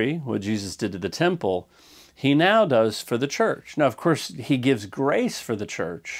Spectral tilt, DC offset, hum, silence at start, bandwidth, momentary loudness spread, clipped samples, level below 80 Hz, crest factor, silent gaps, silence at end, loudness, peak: -5.5 dB/octave; under 0.1%; none; 0 s; 16.5 kHz; 11 LU; under 0.1%; -64 dBFS; 18 dB; none; 0 s; -23 LUFS; -6 dBFS